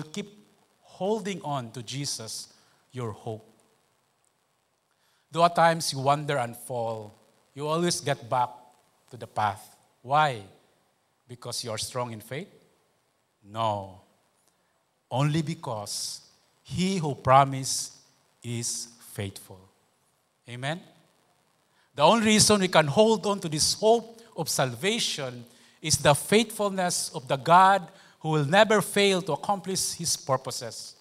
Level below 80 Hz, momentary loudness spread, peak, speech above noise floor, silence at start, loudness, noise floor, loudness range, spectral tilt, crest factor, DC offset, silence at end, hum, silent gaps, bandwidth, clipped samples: -62 dBFS; 18 LU; -4 dBFS; 46 dB; 0 s; -25 LUFS; -72 dBFS; 14 LU; -3.5 dB/octave; 24 dB; under 0.1%; 0.1 s; none; none; 16 kHz; under 0.1%